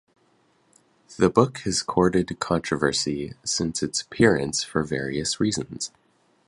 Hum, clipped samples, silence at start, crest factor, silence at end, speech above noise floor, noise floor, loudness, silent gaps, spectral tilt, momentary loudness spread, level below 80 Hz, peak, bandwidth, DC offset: none; under 0.1%; 1.1 s; 24 dB; 0.6 s; 40 dB; -64 dBFS; -24 LUFS; none; -4 dB/octave; 8 LU; -50 dBFS; -2 dBFS; 11.5 kHz; under 0.1%